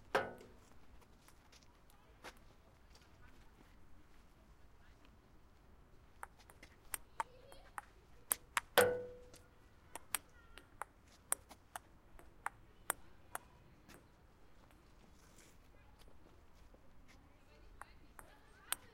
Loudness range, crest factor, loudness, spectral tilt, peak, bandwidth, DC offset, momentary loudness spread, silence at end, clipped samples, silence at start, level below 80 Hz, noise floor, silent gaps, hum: 25 LU; 38 dB; -42 LUFS; -1.5 dB/octave; -10 dBFS; 16 kHz; under 0.1%; 26 LU; 0 s; under 0.1%; 0 s; -66 dBFS; -64 dBFS; none; none